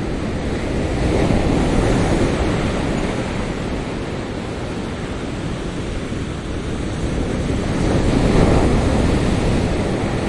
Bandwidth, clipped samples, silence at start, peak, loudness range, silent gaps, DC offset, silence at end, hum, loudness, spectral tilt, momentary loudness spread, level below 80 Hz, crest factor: 11.5 kHz; under 0.1%; 0 s; -2 dBFS; 7 LU; none; under 0.1%; 0 s; none; -20 LUFS; -6.5 dB/octave; 9 LU; -26 dBFS; 18 dB